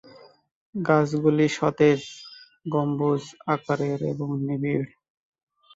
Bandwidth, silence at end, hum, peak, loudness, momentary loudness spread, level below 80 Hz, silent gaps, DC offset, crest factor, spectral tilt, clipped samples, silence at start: 8 kHz; 0.9 s; none; -6 dBFS; -24 LUFS; 17 LU; -64 dBFS; none; under 0.1%; 18 dB; -7 dB/octave; under 0.1%; 0.75 s